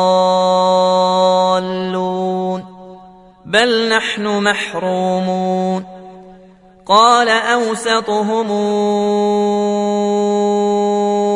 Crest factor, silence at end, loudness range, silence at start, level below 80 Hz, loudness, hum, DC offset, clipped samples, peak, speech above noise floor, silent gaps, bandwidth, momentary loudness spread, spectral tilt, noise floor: 16 dB; 0 s; 3 LU; 0 s; -58 dBFS; -15 LUFS; none; under 0.1%; under 0.1%; 0 dBFS; 29 dB; none; 11 kHz; 7 LU; -4.5 dB/octave; -44 dBFS